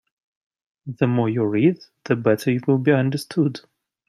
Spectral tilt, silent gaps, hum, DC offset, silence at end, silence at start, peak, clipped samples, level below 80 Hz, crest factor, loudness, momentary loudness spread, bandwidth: -7.5 dB/octave; none; none; under 0.1%; 0.5 s; 0.85 s; -4 dBFS; under 0.1%; -64 dBFS; 18 dB; -21 LUFS; 15 LU; 14.5 kHz